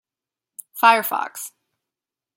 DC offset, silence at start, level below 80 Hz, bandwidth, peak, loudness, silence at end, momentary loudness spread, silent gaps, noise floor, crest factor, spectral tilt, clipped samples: under 0.1%; 0.75 s; -82 dBFS; 17 kHz; -2 dBFS; -19 LUFS; 0.9 s; 20 LU; none; -89 dBFS; 22 dB; -1 dB/octave; under 0.1%